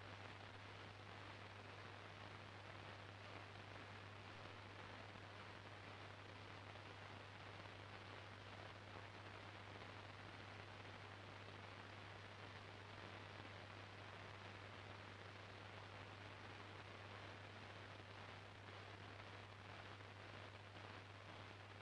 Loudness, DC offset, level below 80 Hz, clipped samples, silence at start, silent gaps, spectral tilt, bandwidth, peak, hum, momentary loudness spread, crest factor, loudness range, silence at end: -57 LUFS; under 0.1%; -78 dBFS; under 0.1%; 0 s; none; -5 dB/octave; 10.5 kHz; -38 dBFS; none; 1 LU; 20 dB; 0 LU; 0 s